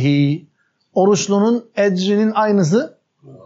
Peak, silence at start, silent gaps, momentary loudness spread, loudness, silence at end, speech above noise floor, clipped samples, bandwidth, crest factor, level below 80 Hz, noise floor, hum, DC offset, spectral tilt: -4 dBFS; 0 s; none; 6 LU; -17 LUFS; 0.15 s; 28 dB; under 0.1%; 8 kHz; 14 dB; -74 dBFS; -44 dBFS; none; under 0.1%; -6 dB/octave